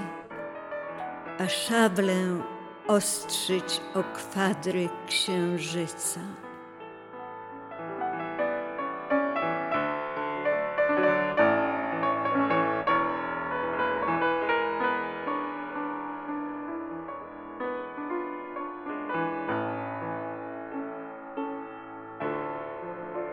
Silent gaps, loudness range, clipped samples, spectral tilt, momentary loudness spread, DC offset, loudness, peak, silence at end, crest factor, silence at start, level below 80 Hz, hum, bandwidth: none; 9 LU; under 0.1%; -4 dB/octave; 14 LU; under 0.1%; -29 LUFS; -10 dBFS; 0 s; 20 dB; 0 s; -70 dBFS; none; 16 kHz